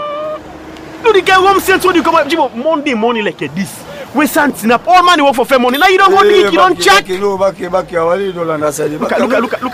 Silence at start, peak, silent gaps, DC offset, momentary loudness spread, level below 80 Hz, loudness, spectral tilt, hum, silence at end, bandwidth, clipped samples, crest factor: 0 s; 0 dBFS; none; under 0.1%; 13 LU; -44 dBFS; -10 LUFS; -3.5 dB/octave; none; 0 s; 16 kHz; under 0.1%; 12 dB